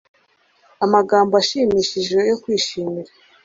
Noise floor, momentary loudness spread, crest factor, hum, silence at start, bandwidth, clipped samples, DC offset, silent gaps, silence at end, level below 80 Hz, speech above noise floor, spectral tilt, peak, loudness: -59 dBFS; 10 LU; 18 dB; none; 0.8 s; 7.8 kHz; under 0.1%; under 0.1%; none; 0.4 s; -56 dBFS; 42 dB; -4 dB/octave; -2 dBFS; -18 LUFS